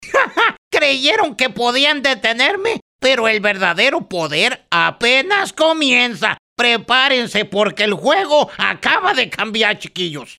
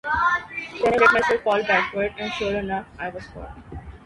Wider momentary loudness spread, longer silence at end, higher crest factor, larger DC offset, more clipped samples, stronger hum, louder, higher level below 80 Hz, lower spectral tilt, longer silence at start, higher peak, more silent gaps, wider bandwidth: second, 6 LU vs 22 LU; about the same, 0.05 s vs 0.1 s; about the same, 16 dB vs 20 dB; neither; neither; neither; first, -15 LUFS vs -21 LUFS; second, -58 dBFS vs -46 dBFS; second, -2.5 dB/octave vs -4.5 dB/octave; about the same, 0 s vs 0.05 s; about the same, 0 dBFS vs -2 dBFS; first, 0.58-0.71 s, 2.82-2.99 s, 6.39-6.56 s vs none; first, 15 kHz vs 11.5 kHz